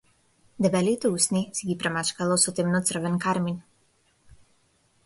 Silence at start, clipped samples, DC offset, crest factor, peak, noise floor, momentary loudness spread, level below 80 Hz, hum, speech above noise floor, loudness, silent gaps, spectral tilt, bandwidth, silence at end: 0.6 s; under 0.1%; under 0.1%; 20 dB; -8 dBFS; -66 dBFS; 6 LU; -62 dBFS; none; 41 dB; -25 LUFS; none; -4 dB/octave; 12 kHz; 1.45 s